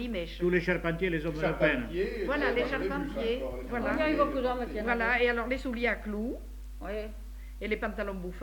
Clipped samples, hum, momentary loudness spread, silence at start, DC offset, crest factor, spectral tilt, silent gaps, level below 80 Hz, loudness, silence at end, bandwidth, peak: under 0.1%; none; 12 LU; 0 s; under 0.1%; 18 dB; -6.5 dB/octave; none; -42 dBFS; -31 LUFS; 0 s; 19 kHz; -12 dBFS